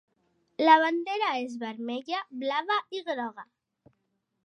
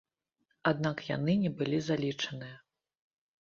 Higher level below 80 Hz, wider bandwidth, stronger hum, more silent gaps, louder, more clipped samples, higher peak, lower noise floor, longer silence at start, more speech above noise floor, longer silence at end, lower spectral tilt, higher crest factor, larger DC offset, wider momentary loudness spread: second, -86 dBFS vs -68 dBFS; first, 9 kHz vs 7.4 kHz; neither; neither; first, -27 LUFS vs -32 LUFS; neither; first, -6 dBFS vs -14 dBFS; about the same, -78 dBFS vs -79 dBFS; about the same, 0.6 s vs 0.65 s; about the same, 50 dB vs 48 dB; first, 1 s vs 0.85 s; second, -3.5 dB/octave vs -6.5 dB/octave; about the same, 22 dB vs 20 dB; neither; first, 15 LU vs 7 LU